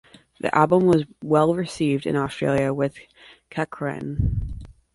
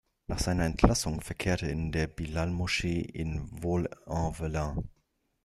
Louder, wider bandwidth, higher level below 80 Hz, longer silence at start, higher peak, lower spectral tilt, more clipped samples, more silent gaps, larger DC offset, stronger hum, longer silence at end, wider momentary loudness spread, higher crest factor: first, -22 LUFS vs -31 LUFS; second, 11.5 kHz vs 13.5 kHz; about the same, -38 dBFS vs -40 dBFS; first, 0.45 s vs 0.3 s; first, -2 dBFS vs -6 dBFS; first, -7.5 dB/octave vs -5.5 dB/octave; neither; neither; neither; neither; second, 0.25 s vs 0.55 s; about the same, 12 LU vs 10 LU; second, 20 dB vs 26 dB